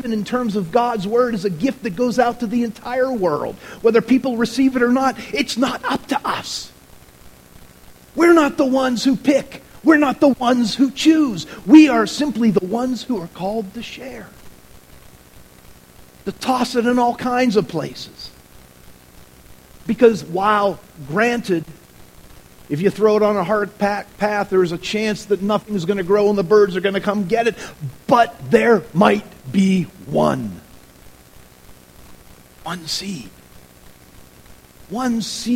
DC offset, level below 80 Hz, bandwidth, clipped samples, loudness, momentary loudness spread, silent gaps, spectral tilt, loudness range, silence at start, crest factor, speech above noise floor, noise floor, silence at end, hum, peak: 0.2%; -50 dBFS; 16.5 kHz; under 0.1%; -18 LUFS; 16 LU; none; -5.5 dB/octave; 12 LU; 0 s; 18 dB; 28 dB; -45 dBFS; 0 s; none; 0 dBFS